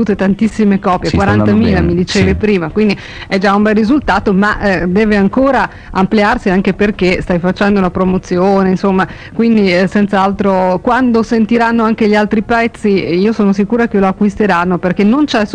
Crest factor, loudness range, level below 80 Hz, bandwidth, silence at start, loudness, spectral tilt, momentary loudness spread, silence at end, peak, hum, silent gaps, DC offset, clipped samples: 8 dB; 1 LU; -32 dBFS; 9.6 kHz; 0 s; -12 LUFS; -7 dB/octave; 3 LU; 0 s; -2 dBFS; none; none; under 0.1%; under 0.1%